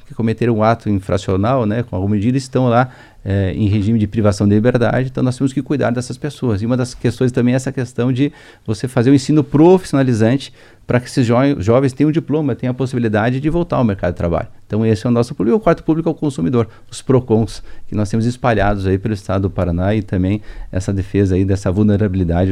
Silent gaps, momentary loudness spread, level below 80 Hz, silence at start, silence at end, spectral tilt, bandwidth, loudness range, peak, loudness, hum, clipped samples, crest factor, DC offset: none; 8 LU; -36 dBFS; 0.05 s; 0 s; -7.5 dB/octave; 11.5 kHz; 3 LU; 0 dBFS; -16 LUFS; none; under 0.1%; 16 dB; under 0.1%